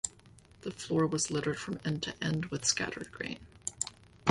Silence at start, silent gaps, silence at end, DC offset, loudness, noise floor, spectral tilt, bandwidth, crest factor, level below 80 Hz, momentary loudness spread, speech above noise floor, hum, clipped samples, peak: 0.05 s; none; 0 s; under 0.1%; -34 LUFS; -58 dBFS; -3.5 dB/octave; 11.5 kHz; 24 dB; -62 dBFS; 11 LU; 24 dB; none; under 0.1%; -10 dBFS